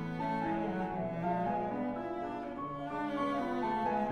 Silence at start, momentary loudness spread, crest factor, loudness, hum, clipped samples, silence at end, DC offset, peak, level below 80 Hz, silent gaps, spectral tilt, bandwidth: 0 s; 6 LU; 14 dB; -36 LUFS; none; under 0.1%; 0 s; under 0.1%; -22 dBFS; -58 dBFS; none; -8 dB/octave; 11 kHz